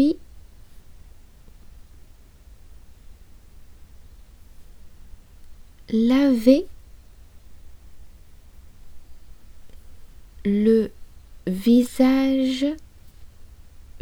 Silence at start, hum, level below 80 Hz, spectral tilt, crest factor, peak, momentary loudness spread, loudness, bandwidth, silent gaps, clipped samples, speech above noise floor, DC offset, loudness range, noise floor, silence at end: 0 s; none; -46 dBFS; -6.5 dB/octave; 22 dB; -4 dBFS; 14 LU; -20 LUFS; 17 kHz; none; under 0.1%; 29 dB; under 0.1%; 7 LU; -47 dBFS; 0.05 s